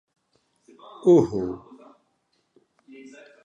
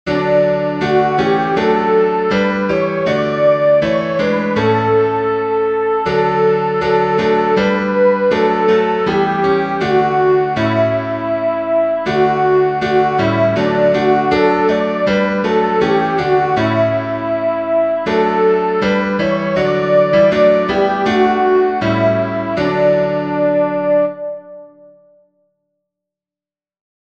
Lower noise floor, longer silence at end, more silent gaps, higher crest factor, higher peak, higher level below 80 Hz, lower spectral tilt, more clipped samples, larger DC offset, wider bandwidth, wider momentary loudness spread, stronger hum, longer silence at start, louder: second, -71 dBFS vs under -90 dBFS; second, 1.9 s vs 2.4 s; neither; first, 20 dB vs 14 dB; second, -6 dBFS vs -2 dBFS; second, -60 dBFS vs -46 dBFS; first, -8.5 dB/octave vs -7 dB/octave; neither; second, under 0.1% vs 0.2%; about the same, 7.6 kHz vs 7.8 kHz; first, 28 LU vs 4 LU; neither; first, 1.05 s vs 0.05 s; second, -21 LUFS vs -14 LUFS